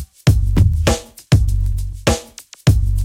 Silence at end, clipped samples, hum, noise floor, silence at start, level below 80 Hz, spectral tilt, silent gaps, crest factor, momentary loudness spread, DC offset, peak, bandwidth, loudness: 0 s; under 0.1%; none; -37 dBFS; 0 s; -20 dBFS; -5.5 dB/octave; none; 16 dB; 8 LU; under 0.1%; 0 dBFS; 16 kHz; -17 LUFS